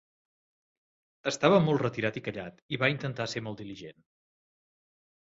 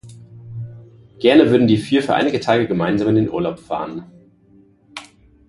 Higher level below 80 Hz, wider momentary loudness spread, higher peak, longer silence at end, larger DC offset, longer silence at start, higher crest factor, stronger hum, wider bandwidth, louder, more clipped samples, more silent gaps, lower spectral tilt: second, -66 dBFS vs -50 dBFS; second, 18 LU vs 23 LU; second, -8 dBFS vs 0 dBFS; first, 1.35 s vs 0.45 s; neither; first, 1.25 s vs 0.05 s; first, 24 dB vs 18 dB; neither; second, 8 kHz vs 11.5 kHz; second, -29 LUFS vs -17 LUFS; neither; first, 2.62-2.69 s vs none; second, -5.5 dB/octave vs -7 dB/octave